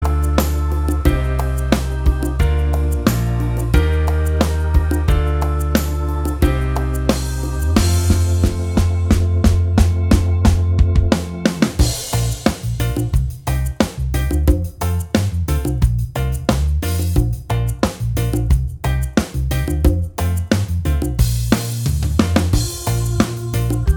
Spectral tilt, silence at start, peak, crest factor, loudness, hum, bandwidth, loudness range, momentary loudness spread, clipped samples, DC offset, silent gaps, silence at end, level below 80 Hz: -6 dB/octave; 0 s; 0 dBFS; 16 dB; -18 LUFS; none; over 20 kHz; 3 LU; 5 LU; under 0.1%; under 0.1%; none; 0 s; -20 dBFS